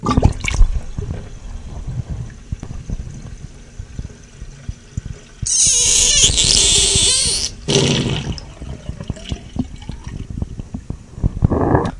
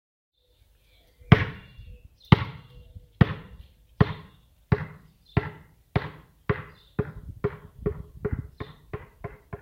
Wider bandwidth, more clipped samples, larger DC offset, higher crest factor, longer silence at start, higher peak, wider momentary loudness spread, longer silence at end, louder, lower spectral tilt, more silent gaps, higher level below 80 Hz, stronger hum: first, 11.5 kHz vs 6.4 kHz; neither; neither; second, 18 dB vs 28 dB; second, 0 s vs 1.3 s; about the same, 0 dBFS vs 0 dBFS; first, 24 LU vs 21 LU; about the same, 0 s vs 0.05 s; first, -14 LUFS vs -27 LUFS; second, -2.5 dB/octave vs -8.5 dB/octave; neither; first, -26 dBFS vs -42 dBFS; neither